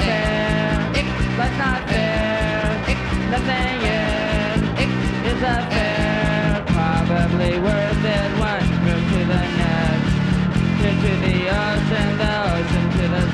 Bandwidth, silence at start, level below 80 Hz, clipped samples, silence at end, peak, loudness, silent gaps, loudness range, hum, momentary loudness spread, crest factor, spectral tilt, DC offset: 11 kHz; 0 s; -28 dBFS; under 0.1%; 0 s; -6 dBFS; -19 LUFS; none; 1 LU; none; 2 LU; 14 dB; -6.5 dB/octave; under 0.1%